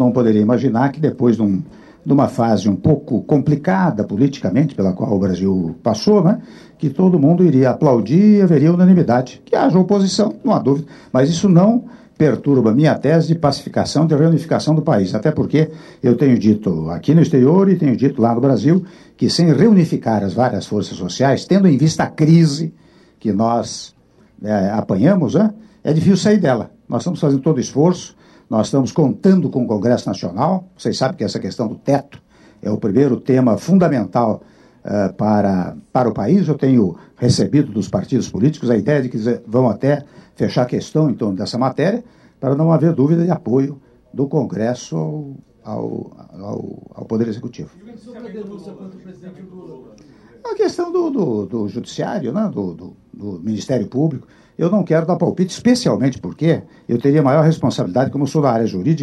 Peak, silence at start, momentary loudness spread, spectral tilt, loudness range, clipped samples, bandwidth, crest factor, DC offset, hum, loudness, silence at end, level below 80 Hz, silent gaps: -2 dBFS; 0 s; 13 LU; -7.5 dB/octave; 9 LU; under 0.1%; 10 kHz; 14 dB; under 0.1%; none; -16 LUFS; 0 s; -52 dBFS; none